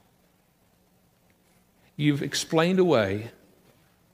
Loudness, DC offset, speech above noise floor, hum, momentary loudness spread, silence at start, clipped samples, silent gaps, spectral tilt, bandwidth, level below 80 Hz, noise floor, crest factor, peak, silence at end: -24 LUFS; under 0.1%; 41 dB; none; 17 LU; 2 s; under 0.1%; none; -5.5 dB/octave; 15.5 kHz; -68 dBFS; -64 dBFS; 20 dB; -8 dBFS; 0.85 s